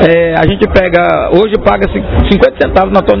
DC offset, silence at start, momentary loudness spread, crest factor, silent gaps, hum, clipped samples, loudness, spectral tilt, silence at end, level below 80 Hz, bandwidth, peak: under 0.1%; 0 s; 3 LU; 8 dB; none; none; 4%; -9 LUFS; -8.5 dB/octave; 0 s; -20 dBFS; 5.4 kHz; 0 dBFS